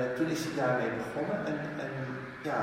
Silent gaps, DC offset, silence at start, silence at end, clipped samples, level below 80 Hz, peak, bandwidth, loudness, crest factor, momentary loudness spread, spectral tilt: none; under 0.1%; 0 s; 0 s; under 0.1%; -66 dBFS; -18 dBFS; 16 kHz; -33 LUFS; 16 dB; 8 LU; -6 dB/octave